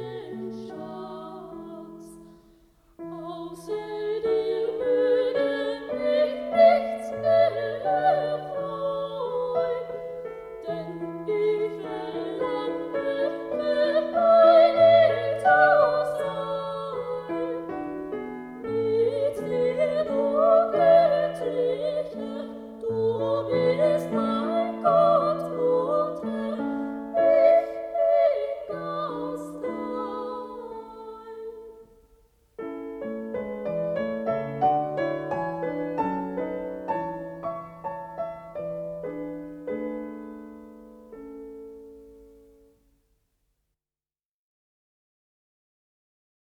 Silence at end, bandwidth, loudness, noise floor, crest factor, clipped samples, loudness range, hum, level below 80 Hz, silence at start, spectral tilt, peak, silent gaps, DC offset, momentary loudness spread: 4.35 s; 11 kHz; -25 LUFS; under -90 dBFS; 20 dB; under 0.1%; 16 LU; none; -62 dBFS; 0 s; -6.5 dB/octave; -6 dBFS; none; under 0.1%; 19 LU